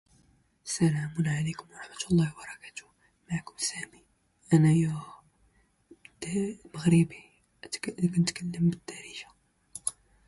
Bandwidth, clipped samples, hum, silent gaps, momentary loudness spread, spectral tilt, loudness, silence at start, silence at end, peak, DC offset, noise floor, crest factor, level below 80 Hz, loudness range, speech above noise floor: 11.5 kHz; under 0.1%; none; none; 20 LU; -5.5 dB/octave; -29 LUFS; 0.65 s; 0.35 s; -10 dBFS; under 0.1%; -67 dBFS; 20 dB; -62 dBFS; 4 LU; 39 dB